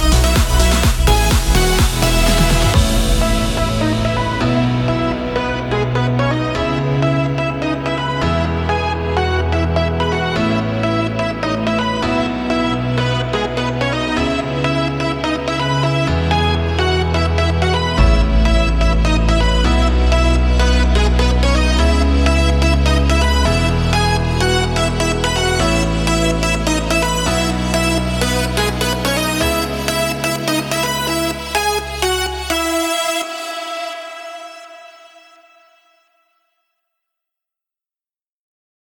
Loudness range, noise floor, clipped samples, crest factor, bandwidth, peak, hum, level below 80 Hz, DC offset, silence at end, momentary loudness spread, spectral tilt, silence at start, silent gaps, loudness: 4 LU; under -90 dBFS; under 0.1%; 14 dB; 19 kHz; -2 dBFS; none; -20 dBFS; under 0.1%; 4.05 s; 5 LU; -5 dB/octave; 0 s; none; -16 LUFS